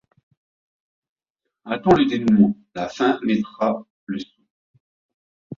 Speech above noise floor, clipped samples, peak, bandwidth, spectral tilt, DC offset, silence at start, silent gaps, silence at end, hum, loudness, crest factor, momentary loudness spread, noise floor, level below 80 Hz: 62 dB; under 0.1%; -2 dBFS; 7.2 kHz; -7 dB/octave; under 0.1%; 1.65 s; 3.90-4.07 s, 4.50-4.74 s, 4.80-5.50 s; 0.05 s; none; -21 LUFS; 20 dB; 15 LU; -82 dBFS; -56 dBFS